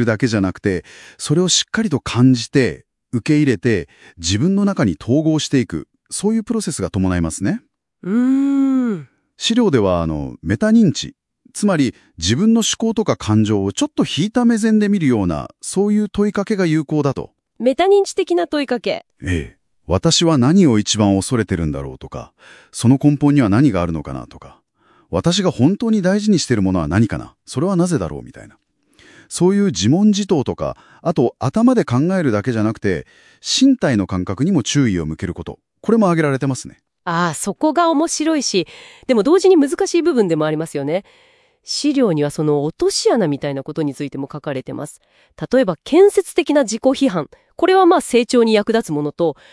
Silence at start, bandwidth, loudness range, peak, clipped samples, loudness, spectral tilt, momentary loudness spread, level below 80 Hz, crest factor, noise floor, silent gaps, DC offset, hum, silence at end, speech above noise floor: 0 s; 12 kHz; 3 LU; -2 dBFS; under 0.1%; -17 LUFS; -5.5 dB/octave; 12 LU; -46 dBFS; 16 dB; -56 dBFS; none; under 0.1%; none; 0.2 s; 39 dB